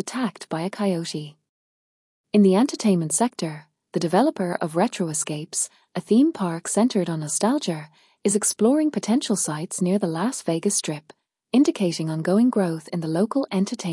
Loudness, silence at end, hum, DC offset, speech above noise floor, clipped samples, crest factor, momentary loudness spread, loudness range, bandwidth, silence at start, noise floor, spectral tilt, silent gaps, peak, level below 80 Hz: -23 LUFS; 0 s; none; under 0.1%; over 68 dB; under 0.1%; 16 dB; 10 LU; 2 LU; 12 kHz; 0.05 s; under -90 dBFS; -5 dB/octave; 1.49-2.24 s; -8 dBFS; -74 dBFS